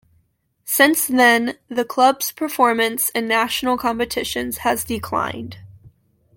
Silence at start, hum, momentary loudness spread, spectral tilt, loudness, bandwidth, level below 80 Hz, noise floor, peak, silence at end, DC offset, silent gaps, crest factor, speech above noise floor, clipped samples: 0.65 s; none; 10 LU; -2.5 dB/octave; -18 LUFS; 17 kHz; -52 dBFS; -64 dBFS; -2 dBFS; 0.5 s; under 0.1%; none; 18 dB; 45 dB; under 0.1%